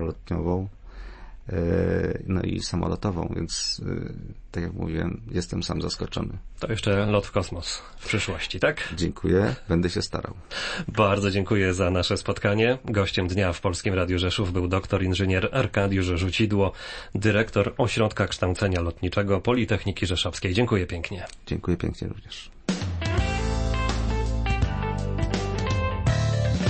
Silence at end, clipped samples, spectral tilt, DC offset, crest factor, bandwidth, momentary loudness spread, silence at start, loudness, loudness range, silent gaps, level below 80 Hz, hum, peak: 0 s; under 0.1%; -5.5 dB/octave; under 0.1%; 18 dB; 8.8 kHz; 10 LU; 0 s; -26 LUFS; 5 LU; none; -36 dBFS; none; -8 dBFS